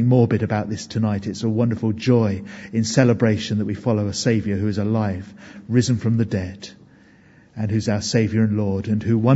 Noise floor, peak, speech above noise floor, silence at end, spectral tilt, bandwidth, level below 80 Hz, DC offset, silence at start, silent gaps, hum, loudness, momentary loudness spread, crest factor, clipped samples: -51 dBFS; -2 dBFS; 31 dB; 0 s; -6.5 dB/octave; 8 kHz; -54 dBFS; under 0.1%; 0 s; none; none; -21 LUFS; 11 LU; 18 dB; under 0.1%